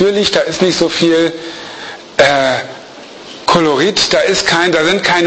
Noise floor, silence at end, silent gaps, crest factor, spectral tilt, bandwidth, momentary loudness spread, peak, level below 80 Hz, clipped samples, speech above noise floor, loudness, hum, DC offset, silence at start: -33 dBFS; 0 s; none; 12 dB; -3.5 dB/octave; 8.8 kHz; 17 LU; 0 dBFS; -46 dBFS; under 0.1%; 21 dB; -12 LUFS; none; under 0.1%; 0 s